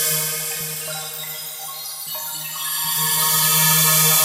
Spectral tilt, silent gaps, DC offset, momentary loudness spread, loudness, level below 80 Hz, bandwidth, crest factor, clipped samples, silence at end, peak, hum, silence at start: -1 dB/octave; none; under 0.1%; 15 LU; -18 LUFS; -68 dBFS; 16 kHz; 18 dB; under 0.1%; 0 s; -2 dBFS; none; 0 s